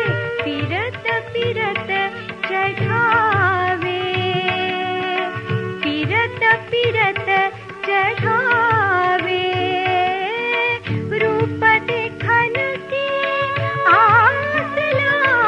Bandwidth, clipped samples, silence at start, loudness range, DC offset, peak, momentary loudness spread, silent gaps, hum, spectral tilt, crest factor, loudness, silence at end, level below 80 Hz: 9.8 kHz; under 0.1%; 0 s; 3 LU; under 0.1%; -2 dBFS; 7 LU; none; none; -6.5 dB/octave; 16 dB; -18 LUFS; 0 s; -54 dBFS